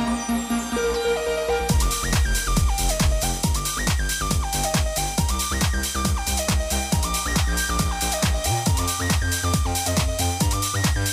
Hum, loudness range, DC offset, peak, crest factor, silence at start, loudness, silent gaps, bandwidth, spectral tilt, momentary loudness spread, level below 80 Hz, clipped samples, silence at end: none; 1 LU; under 0.1%; -6 dBFS; 16 dB; 0 s; -22 LUFS; none; 16.5 kHz; -3.5 dB/octave; 2 LU; -26 dBFS; under 0.1%; 0 s